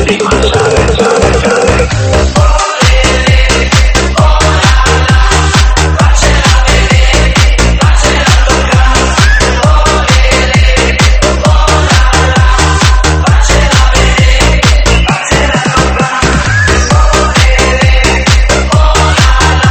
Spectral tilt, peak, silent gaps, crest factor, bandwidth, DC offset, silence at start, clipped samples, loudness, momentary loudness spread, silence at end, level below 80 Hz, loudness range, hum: -4 dB/octave; 0 dBFS; none; 6 dB; 11.5 kHz; 0.4%; 0 s; 2%; -7 LUFS; 2 LU; 0 s; -10 dBFS; 1 LU; none